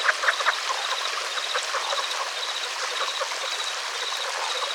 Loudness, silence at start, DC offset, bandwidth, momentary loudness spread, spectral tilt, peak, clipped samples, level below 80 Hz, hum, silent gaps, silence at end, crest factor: -25 LUFS; 0 s; under 0.1%; 18 kHz; 5 LU; 4.5 dB/octave; -6 dBFS; under 0.1%; under -90 dBFS; none; none; 0 s; 20 dB